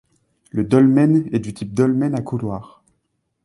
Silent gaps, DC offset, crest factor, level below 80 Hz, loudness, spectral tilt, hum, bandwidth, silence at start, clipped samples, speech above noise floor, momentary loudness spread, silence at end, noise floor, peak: none; under 0.1%; 18 dB; -52 dBFS; -18 LUFS; -8.5 dB/octave; none; 11.5 kHz; 0.55 s; under 0.1%; 54 dB; 14 LU; 0.8 s; -71 dBFS; -2 dBFS